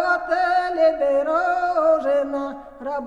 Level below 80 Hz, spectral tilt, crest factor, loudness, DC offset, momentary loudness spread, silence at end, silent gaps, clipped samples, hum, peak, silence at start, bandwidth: -54 dBFS; -4 dB/octave; 14 dB; -20 LUFS; 0.2%; 11 LU; 0 s; none; under 0.1%; none; -8 dBFS; 0 s; 9.6 kHz